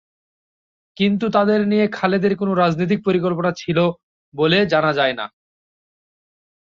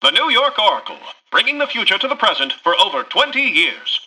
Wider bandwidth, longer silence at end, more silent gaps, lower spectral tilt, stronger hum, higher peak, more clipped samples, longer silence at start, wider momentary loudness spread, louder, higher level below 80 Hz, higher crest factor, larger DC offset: second, 7.2 kHz vs 11 kHz; first, 1.4 s vs 0 s; first, 4.03-4.32 s vs none; first, -7 dB/octave vs -1 dB/octave; neither; about the same, -2 dBFS vs -2 dBFS; neither; first, 1 s vs 0 s; about the same, 5 LU vs 5 LU; second, -18 LUFS vs -15 LUFS; first, -58 dBFS vs -66 dBFS; about the same, 16 dB vs 16 dB; neither